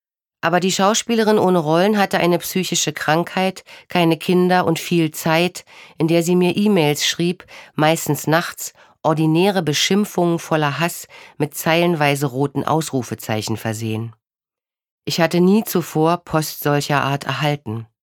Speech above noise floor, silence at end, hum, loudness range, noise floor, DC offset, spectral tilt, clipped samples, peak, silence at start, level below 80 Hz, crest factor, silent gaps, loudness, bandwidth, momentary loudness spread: over 72 dB; 0.25 s; none; 3 LU; under -90 dBFS; under 0.1%; -5 dB/octave; under 0.1%; -2 dBFS; 0.45 s; -60 dBFS; 18 dB; 14.91-14.98 s; -18 LUFS; 19 kHz; 9 LU